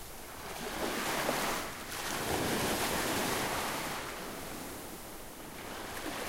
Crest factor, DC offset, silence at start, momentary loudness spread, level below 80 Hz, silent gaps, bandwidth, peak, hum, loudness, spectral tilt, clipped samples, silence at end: 18 dB; under 0.1%; 0 s; 13 LU; -54 dBFS; none; 16 kHz; -18 dBFS; none; -35 LUFS; -2.5 dB/octave; under 0.1%; 0 s